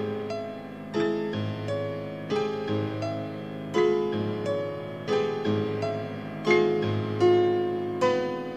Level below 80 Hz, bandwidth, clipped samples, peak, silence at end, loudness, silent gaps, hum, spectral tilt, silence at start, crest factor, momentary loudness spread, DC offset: -66 dBFS; 8.8 kHz; under 0.1%; -10 dBFS; 0 s; -28 LUFS; none; none; -7 dB/octave; 0 s; 18 dB; 11 LU; 0.1%